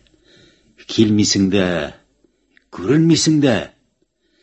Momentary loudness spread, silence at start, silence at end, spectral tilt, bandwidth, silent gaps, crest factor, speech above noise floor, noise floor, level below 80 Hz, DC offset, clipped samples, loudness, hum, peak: 15 LU; 0.9 s; 0.75 s; -5 dB/octave; 8.4 kHz; none; 18 dB; 50 dB; -65 dBFS; -46 dBFS; under 0.1%; under 0.1%; -16 LUFS; none; 0 dBFS